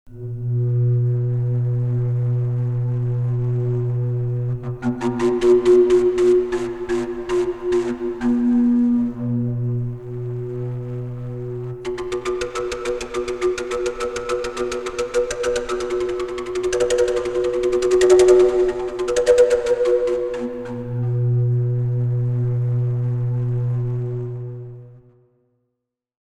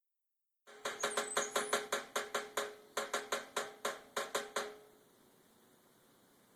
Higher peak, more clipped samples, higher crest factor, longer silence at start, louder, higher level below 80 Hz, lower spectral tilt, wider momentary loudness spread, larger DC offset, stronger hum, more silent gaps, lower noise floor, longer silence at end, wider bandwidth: first, -2 dBFS vs -18 dBFS; neither; second, 18 dB vs 24 dB; second, 0.05 s vs 0.65 s; first, -20 LUFS vs -39 LUFS; first, -44 dBFS vs -84 dBFS; first, -7.5 dB/octave vs 0 dB/octave; first, 12 LU vs 8 LU; first, 0.3% vs under 0.1%; neither; neither; second, -79 dBFS vs -87 dBFS; second, 1.3 s vs 1.65 s; second, 11.5 kHz vs over 20 kHz